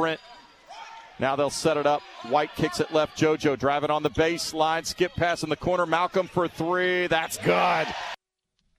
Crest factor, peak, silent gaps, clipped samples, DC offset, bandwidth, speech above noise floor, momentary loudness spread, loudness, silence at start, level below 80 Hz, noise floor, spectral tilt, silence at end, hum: 18 dB; -8 dBFS; none; under 0.1%; under 0.1%; 14 kHz; 52 dB; 8 LU; -25 LUFS; 0 s; -54 dBFS; -77 dBFS; -4.5 dB/octave; 0.65 s; none